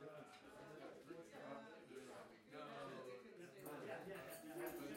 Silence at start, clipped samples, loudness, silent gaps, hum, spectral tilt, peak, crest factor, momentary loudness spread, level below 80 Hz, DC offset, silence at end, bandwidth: 0 s; under 0.1%; -56 LUFS; none; none; -4.5 dB/octave; -38 dBFS; 18 dB; 8 LU; -86 dBFS; under 0.1%; 0 s; 16 kHz